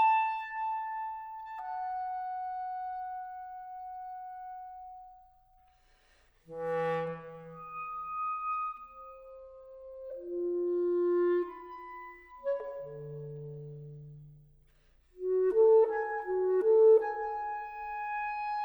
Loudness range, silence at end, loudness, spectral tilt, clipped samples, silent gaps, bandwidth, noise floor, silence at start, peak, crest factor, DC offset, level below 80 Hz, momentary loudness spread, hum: 15 LU; 0 s; -32 LUFS; -8.5 dB/octave; under 0.1%; none; 5.4 kHz; -66 dBFS; 0 s; -16 dBFS; 18 dB; under 0.1%; -66 dBFS; 22 LU; none